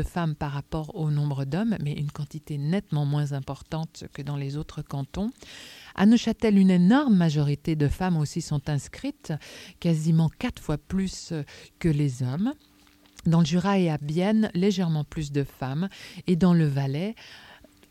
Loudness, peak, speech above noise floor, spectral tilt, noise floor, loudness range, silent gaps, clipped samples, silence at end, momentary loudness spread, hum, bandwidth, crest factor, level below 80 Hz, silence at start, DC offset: -26 LUFS; -8 dBFS; 32 dB; -7 dB/octave; -57 dBFS; 7 LU; none; under 0.1%; 0.35 s; 15 LU; none; 13.5 kHz; 16 dB; -48 dBFS; 0 s; under 0.1%